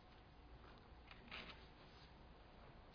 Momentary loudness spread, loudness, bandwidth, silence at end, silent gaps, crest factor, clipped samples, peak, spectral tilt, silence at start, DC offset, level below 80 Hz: 10 LU; -60 LUFS; 5.4 kHz; 0 s; none; 22 dB; under 0.1%; -40 dBFS; -2.5 dB/octave; 0 s; under 0.1%; -66 dBFS